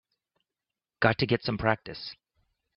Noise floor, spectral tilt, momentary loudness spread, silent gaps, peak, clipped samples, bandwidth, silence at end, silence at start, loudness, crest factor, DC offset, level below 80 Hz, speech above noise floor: -90 dBFS; -8.5 dB/octave; 15 LU; none; -6 dBFS; under 0.1%; 6 kHz; 0.65 s; 1 s; -27 LUFS; 26 dB; under 0.1%; -56 dBFS; 62 dB